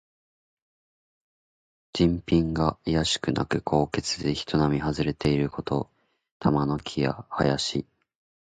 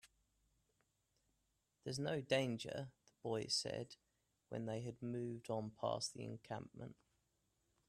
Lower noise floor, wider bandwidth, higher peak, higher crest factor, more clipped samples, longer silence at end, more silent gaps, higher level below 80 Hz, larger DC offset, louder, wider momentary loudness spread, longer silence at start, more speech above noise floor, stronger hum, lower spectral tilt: first, under -90 dBFS vs -85 dBFS; second, 9.4 kHz vs 13.5 kHz; first, -6 dBFS vs -24 dBFS; about the same, 20 dB vs 22 dB; neither; second, 0.65 s vs 0.95 s; first, 6.31-6.40 s vs none; first, -46 dBFS vs -78 dBFS; neither; first, -26 LUFS vs -44 LUFS; second, 5 LU vs 16 LU; first, 1.95 s vs 0.05 s; first, over 65 dB vs 41 dB; neither; about the same, -5.5 dB/octave vs -4.5 dB/octave